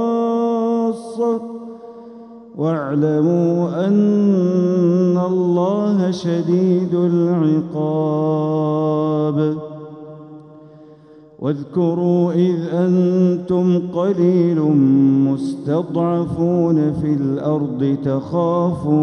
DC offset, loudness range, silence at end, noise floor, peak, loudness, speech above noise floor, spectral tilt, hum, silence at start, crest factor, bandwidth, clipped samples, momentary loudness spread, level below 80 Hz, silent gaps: under 0.1%; 5 LU; 0 s; -44 dBFS; -4 dBFS; -17 LUFS; 28 dB; -9.5 dB/octave; none; 0 s; 12 dB; 8.6 kHz; under 0.1%; 9 LU; -56 dBFS; none